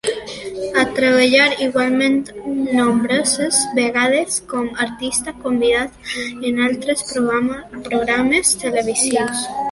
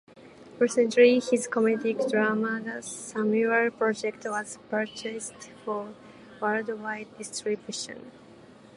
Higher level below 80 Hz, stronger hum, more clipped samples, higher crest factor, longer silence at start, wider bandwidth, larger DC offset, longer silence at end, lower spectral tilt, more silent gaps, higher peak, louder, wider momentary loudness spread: first, -50 dBFS vs -74 dBFS; neither; neither; about the same, 18 dB vs 22 dB; about the same, 0.05 s vs 0.15 s; about the same, 12 kHz vs 11.5 kHz; neither; second, 0 s vs 0.6 s; second, -2.5 dB/octave vs -4 dB/octave; neither; first, 0 dBFS vs -6 dBFS; first, -17 LUFS vs -27 LUFS; second, 10 LU vs 14 LU